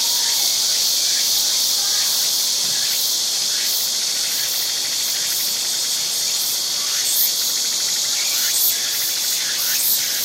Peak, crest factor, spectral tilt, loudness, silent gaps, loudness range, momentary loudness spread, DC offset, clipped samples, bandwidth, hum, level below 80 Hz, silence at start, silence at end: -4 dBFS; 16 dB; 2.5 dB/octave; -17 LUFS; none; 2 LU; 3 LU; under 0.1%; under 0.1%; 16.5 kHz; none; -76 dBFS; 0 s; 0 s